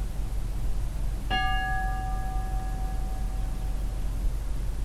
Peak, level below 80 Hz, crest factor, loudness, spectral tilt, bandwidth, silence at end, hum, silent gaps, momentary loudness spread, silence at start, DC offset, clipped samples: -14 dBFS; -30 dBFS; 14 dB; -32 LUFS; -5 dB/octave; 13.5 kHz; 0 s; none; none; 6 LU; 0 s; under 0.1%; under 0.1%